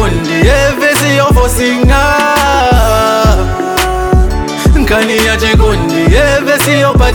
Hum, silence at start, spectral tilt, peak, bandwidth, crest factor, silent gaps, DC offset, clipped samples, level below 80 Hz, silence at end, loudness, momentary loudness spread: none; 0 s; -5 dB/octave; 0 dBFS; 19.5 kHz; 8 dB; none; 0.1%; under 0.1%; -14 dBFS; 0 s; -9 LUFS; 4 LU